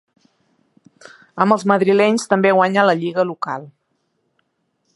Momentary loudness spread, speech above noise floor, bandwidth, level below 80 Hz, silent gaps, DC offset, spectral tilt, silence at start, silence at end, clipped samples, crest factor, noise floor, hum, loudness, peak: 12 LU; 53 dB; 11.5 kHz; -70 dBFS; none; under 0.1%; -5.5 dB/octave; 1.35 s; 1.25 s; under 0.1%; 18 dB; -69 dBFS; none; -16 LUFS; 0 dBFS